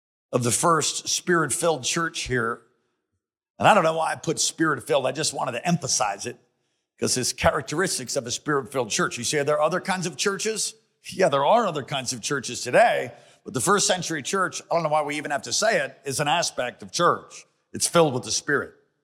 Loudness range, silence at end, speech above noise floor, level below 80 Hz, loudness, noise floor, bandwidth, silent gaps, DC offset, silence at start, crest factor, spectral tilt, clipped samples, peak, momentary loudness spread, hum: 2 LU; 0.35 s; 57 dB; -58 dBFS; -23 LUFS; -81 dBFS; 16.5 kHz; 3.50-3.55 s; under 0.1%; 0.3 s; 20 dB; -3 dB/octave; under 0.1%; -4 dBFS; 8 LU; none